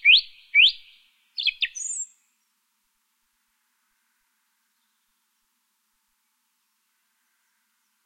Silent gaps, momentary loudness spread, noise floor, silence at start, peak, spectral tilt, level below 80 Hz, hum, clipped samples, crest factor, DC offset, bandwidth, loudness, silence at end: none; 21 LU; -73 dBFS; 0.05 s; -6 dBFS; 8.5 dB/octave; -74 dBFS; none; under 0.1%; 22 dB; under 0.1%; 14 kHz; -20 LUFS; 6 s